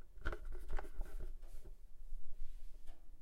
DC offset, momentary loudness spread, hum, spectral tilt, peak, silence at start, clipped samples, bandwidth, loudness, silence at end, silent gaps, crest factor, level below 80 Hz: under 0.1%; 14 LU; none; -6 dB/octave; -24 dBFS; 0 s; under 0.1%; 3.9 kHz; -54 LUFS; 0 s; none; 14 dB; -46 dBFS